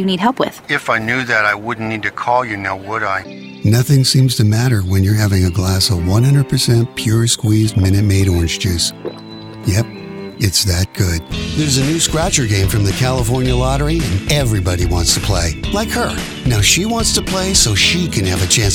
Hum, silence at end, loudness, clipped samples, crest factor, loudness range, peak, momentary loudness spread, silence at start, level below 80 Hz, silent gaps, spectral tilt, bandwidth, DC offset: none; 0 s; -15 LUFS; under 0.1%; 14 dB; 3 LU; 0 dBFS; 8 LU; 0 s; -30 dBFS; none; -4 dB/octave; 17 kHz; under 0.1%